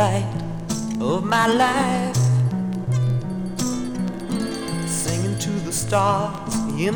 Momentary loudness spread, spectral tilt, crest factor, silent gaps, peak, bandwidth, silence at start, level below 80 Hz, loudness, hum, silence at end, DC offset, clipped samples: 8 LU; -5 dB/octave; 18 dB; none; -4 dBFS; over 20 kHz; 0 s; -46 dBFS; -22 LUFS; none; 0 s; under 0.1%; under 0.1%